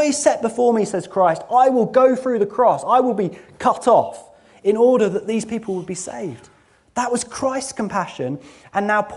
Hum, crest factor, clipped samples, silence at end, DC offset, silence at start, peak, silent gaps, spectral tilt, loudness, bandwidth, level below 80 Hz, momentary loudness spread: none; 16 dB; under 0.1%; 0 s; under 0.1%; 0 s; -2 dBFS; none; -5 dB/octave; -19 LUFS; 11.5 kHz; -60 dBFS; 12 LU